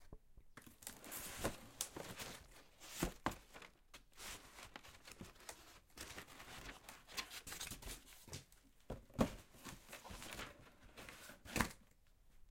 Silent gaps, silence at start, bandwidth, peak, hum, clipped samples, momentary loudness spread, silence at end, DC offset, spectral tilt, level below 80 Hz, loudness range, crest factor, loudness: none; 0 s; 16.5 kHz; -18 dBFS; none; under 0.1%; 19 LU; 0 s; under 0.1%; -3.5 dB/octave; -62 dBFS; 6 LU; 32 dB; -49 LUFS